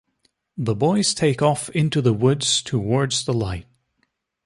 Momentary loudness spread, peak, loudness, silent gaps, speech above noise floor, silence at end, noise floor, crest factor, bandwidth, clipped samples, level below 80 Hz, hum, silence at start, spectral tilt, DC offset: 9 LU; -4 dBFS; -20 LUFS; none; 51 dB; 0.85 s; -71 dBFS; 18 dB; 11.5 kHz; under 0.1%; -48 dBFS; none; 0.55 s; -5 dB/octave; under 0.1%